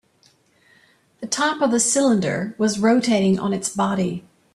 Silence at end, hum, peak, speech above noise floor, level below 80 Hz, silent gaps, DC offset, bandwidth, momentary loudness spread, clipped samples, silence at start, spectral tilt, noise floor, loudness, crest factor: 0.35 s; none; -6 dBFS; 40 dB; -60 dBFS; none; under 0.1%; 13 kHz; 9 LU; under 0.1%; 1.2 s; -4 dB/octave; -59 dBFS; -20 LUFS; 16 dB